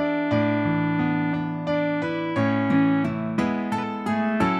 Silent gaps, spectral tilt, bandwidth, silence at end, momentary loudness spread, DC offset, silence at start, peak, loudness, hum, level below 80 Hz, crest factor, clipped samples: none; -8 dB/octave; 11 kHz; 0 s; 6 LU; under 0.1%; 0 s; -8 dBFS; -24 LUFS; none; -54 dBFS; 14 dB; under 0.1%